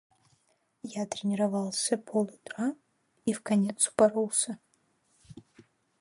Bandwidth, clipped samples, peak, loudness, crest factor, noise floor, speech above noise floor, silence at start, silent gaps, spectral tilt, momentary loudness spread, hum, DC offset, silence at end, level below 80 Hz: 11.5 kHz; under 0.1%; -10 dBFS; -29 LUFS; 22 dB; -72 dBFS; 43 dB; 0.85 s; none; -4 dB/octave; 13 LU; none; under 0.1%; 0.6 s; -74 dBFS